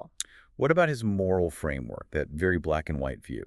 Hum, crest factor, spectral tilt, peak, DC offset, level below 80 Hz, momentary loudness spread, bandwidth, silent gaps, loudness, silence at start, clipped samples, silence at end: none; 22 dB; -6 dB/octave; -6 dBFS; under 0.1%; -46 dBFS; 12 LU; 13 kHz; none; -28 LUFS; 0 s; under 0.1%; 0 s